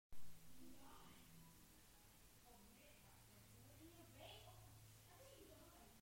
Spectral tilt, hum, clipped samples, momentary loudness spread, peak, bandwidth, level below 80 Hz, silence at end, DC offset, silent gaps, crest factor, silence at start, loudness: -3.5 dB/octave; none; under 0.1%; 6 LU; -40 dBFS; 16 kHz; -74 dBFS; 0 s; under 0.1%; none; 18 dB; 0.1 s; -65 LUFS